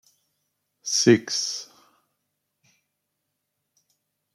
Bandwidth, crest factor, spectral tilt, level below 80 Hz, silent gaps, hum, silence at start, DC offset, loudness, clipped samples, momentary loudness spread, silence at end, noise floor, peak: 13 kHz; 24 dB; -3.5 dB/octave; -74 dBFS; none; 50 Hz at -70 dBFS; 0.85 s; under 0.1%; -22 LUFS; under 0.1%; 18 LU; 2.7 s; -79 dBFS; -4 dBFS